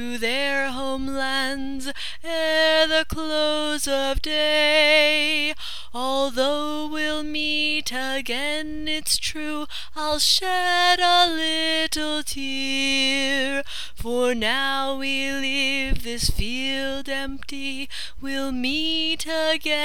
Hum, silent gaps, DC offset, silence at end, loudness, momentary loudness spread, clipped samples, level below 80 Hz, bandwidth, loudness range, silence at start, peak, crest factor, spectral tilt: none; none; 3%; 0 s; -22 LUFS; 12 LU; under 0.1%; -38 dBFS; 18 kHz; 5 LU; 0 s; -4 dBFS; 20 dB; -2 dB/octave